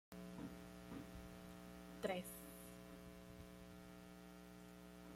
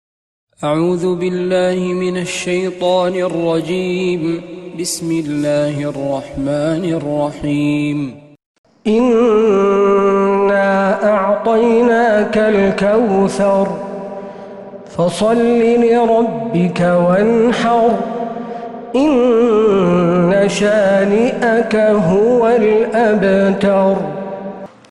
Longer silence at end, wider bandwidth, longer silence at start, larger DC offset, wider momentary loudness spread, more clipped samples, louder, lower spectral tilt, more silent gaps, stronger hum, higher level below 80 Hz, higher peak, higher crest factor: second, 0 s vs 0.25 s; first, 16.5 kHz vs 12 kHz; second, 0.1 s vs 0.6 s; neither; about the same, 12 LU vs 11 LU; neither; second, -55 LUFS vs -14 LUFS; about the same, -5 dB/octave vs -6 dB/octave; second, none vs 8.46-8.64 s; neither; second, -68 dBFS vs -48 dBFS; second, -30 dBFS vs -2 dBFS; first, 24 dB vs 12 dB